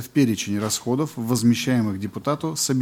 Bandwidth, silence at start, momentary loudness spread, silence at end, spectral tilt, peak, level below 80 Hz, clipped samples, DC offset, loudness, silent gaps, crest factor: 17 kHz; 0 s; 6 LU; 0 s; -5 dB/octave; -8 dBFS; -62 dBFS; under 0.1%; under 0.1%; -23 LUFS; none; 14 dB